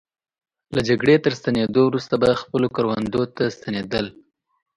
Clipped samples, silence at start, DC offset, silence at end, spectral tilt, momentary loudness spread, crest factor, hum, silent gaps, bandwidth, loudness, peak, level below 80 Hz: under 0.1%; 0.7 s; under 0.1%; 0.65 s; -6.5 dB/octave; 9 LU; 18 dB; none; none; 11 kHz; -21 LUFS; -4 dBFS; -52 dBFS